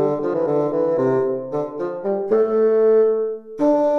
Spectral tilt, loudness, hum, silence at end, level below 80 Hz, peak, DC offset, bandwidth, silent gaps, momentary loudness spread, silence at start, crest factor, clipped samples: -9.5 dB/octave; -19 LUFS; none; 0 s; -60 dBFS; -6 dBFS; under 0.1%; 6 kHz; none; 10 LU; 0 s; 12 dB; under 0.1%